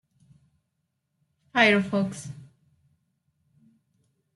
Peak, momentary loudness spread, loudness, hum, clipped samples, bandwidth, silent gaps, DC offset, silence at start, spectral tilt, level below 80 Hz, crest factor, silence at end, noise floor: -4 dBFS; 22 LU; -23 LUFS; none; under 0.1%; 12 kHz; none; under 0.1%; 1.55 s; -5 dB/octave; -72 dBFS; 26 dB; 1.9 s; -78 dBFS